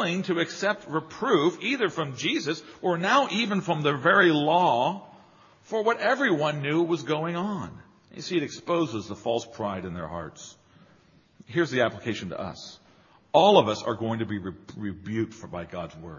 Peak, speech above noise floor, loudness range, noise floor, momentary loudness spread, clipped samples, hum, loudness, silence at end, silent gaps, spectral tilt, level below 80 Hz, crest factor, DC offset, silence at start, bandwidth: -4 dBFS; 33 dB; 8 LU; -59 dBFS; 16 LU; under 0.1%; none; -26 LUFS; 0 s; none; -5 dB/octave; -64 dBFS; 24 dB; under 0.1%; 0 s; 7.4 kHz